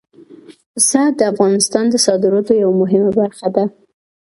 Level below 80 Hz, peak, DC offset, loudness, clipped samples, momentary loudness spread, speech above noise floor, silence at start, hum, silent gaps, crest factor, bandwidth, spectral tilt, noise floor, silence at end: -58 dBFS; 0 dBFS; under 0.1%; -14 LUFS; under 0.1%; 5 LU; 27 dB; 0.3 s; none; 0.66-0.74 s; 14 dB; 12 kHz; -4 dB/octave; -41 dBFS; 0.65 s